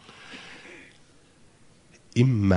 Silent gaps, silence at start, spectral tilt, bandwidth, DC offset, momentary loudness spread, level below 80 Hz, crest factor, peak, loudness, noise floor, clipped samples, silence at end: none; 0.3 s; -7.5 dB/octave; 10.5 kHz; under 0.1%; 24 LU; -46 dBFS; 20 dB; -8 dBFS; -24 LUFS; -56 dBFS; under 0.1%; 0 s